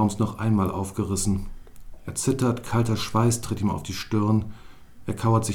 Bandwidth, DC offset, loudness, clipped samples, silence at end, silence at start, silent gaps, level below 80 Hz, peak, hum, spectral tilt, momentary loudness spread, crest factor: 16.5 kHz; under 0.1%; -25 LUFS; under 0.1%; 0 s; 0 s; none; -44 dBFS; -8 dBFS; none; -6 dB/octave; 11 LU; 16 dB